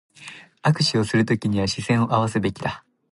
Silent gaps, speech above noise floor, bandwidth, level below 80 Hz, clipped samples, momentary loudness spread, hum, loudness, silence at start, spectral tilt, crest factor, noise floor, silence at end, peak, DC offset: none; 22 dB; 11.5 kHz; -50 dBFS; under 0.1%; 20 LU; none; -22 LUFS; 0.2 s; -5.5 dB/octave; 18 dB; -43 dBFS; 0.3 s; -4 dBFS; under 0.1%